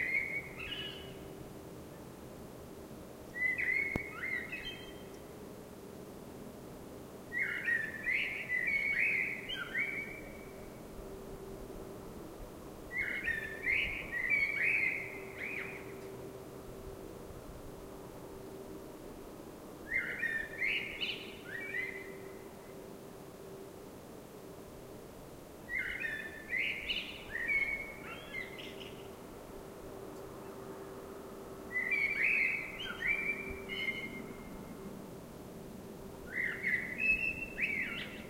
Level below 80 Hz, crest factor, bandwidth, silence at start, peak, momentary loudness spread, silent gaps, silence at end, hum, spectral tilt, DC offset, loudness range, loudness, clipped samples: -58 dBFS; 22 dB; 16 kHz; 0 s; -18 dBFS; 19 LU; none; 0 s; none; -3.5 dB/octave; under 0.1%; 12 LU; -35 LUFS; under 0.1%